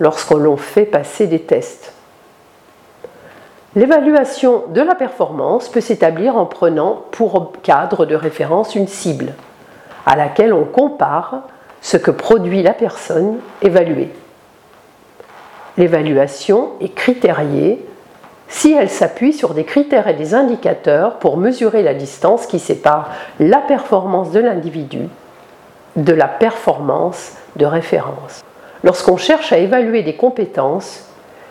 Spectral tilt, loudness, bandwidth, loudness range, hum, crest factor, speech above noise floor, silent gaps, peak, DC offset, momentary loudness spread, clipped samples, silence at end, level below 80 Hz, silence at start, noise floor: -6 dB/octave; -14 LUFS; 14 kHz; 3 LU; none; 14 dB; 32 dB; none; 0 dBFS; under 0.1%; 9 LU; under 0.1%; 0.5 s; -56 dBFS; 0 s; -46 dBFS